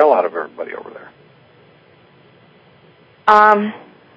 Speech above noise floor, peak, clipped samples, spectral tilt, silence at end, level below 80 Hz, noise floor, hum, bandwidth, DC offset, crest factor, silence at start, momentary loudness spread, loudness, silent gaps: 34 dB; 0 dBFS; 0.2%; -6 dB/octave; 0.4 s; -66 dBFS; -49 dBFS; none; 8 kHz; under 0.1%; 18 dB; 0 s; 23 LU; -14 LUFS; none